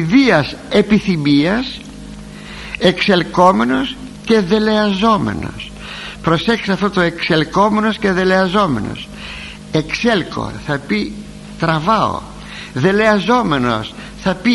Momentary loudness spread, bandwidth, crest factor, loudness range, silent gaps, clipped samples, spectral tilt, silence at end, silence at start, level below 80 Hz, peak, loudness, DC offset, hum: 16 LU; 11.5 kHz; 16 dB; 4 LU; none; under 0.1%; -6 dB/octave; 0 s; 0 s; -38 dBFS; 0 dBFS; -15 LUFS; under 0.1%; none